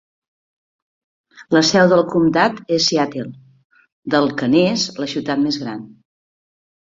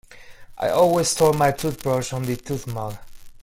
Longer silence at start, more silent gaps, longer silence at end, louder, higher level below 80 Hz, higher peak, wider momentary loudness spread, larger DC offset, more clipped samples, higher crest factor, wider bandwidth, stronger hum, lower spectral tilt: first, 1.4 s vs 0.1 s; first, 3.65-3.70 s, 3.92-4.03 s vs none; first, 1 s vs 0 s; first, -17 LUFS vs -22 LUFS; second, -58 dBFS vs -48 dBFS; about the same, -2 dBFS vs -4 dBFS; about the same, 15 LU vs 13 LU; neither; neither; about the same, 18 dB vs 18 dB; second, 7.8 kHz vs 16.5 kHz; neither; about the same, -4.5 dB/octave vs -4.5 dB/octave